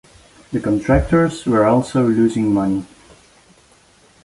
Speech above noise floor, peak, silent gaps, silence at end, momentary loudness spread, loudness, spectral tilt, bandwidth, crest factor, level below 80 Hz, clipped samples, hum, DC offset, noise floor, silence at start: 36 dB; -2 dBFS; none; 1.4 s; 8 LU; -17 LUFS; -7.5 dB/octave; 11.5 kHz; 16 dB; -34 dBFS; under 0.1%; none; under 0.1%; -52 dBFS; 0.5 s